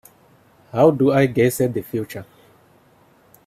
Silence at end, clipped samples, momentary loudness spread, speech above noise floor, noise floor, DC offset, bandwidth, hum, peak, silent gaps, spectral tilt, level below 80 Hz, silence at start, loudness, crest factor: 1.25 s; under 0.1%; 15 LU; 37 dB; -54 dBFS; under 0.1%; 16 kHz; none; -2 dBFS; none; -6.5 dB/octave; -58 dBFS; 0.75 s; -18 LUFS; 20 dB